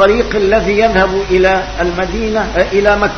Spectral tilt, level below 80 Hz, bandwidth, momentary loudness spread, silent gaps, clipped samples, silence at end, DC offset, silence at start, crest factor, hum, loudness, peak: -5.5 dB/octave; -26 dBFS; 6.6 kHz; 5 LU; none; 0.1%; 0 s; 0.5%; 0 s; 12 dB; none; -12 LUFS; 0 dBFS